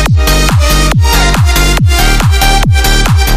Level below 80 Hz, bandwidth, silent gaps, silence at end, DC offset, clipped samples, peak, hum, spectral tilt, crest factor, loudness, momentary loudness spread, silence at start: -10 dBFS; 16 kHz; none; 0 s; under 0.1%; under 0.1%; 0 dBFS; none; -4 dB/octave; 6 dB; -8 LUFS; 1 LU; 0 s